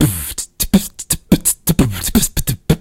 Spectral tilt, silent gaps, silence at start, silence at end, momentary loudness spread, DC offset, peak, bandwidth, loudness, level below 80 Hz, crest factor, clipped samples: -4.5 dB/octave; none; 0 s; 0 s; 7 LU; under 0.1%; 0 dBFS; 17.5 kHz; -16 LUFS; -26 dBFS; 16 dB; under 0.1%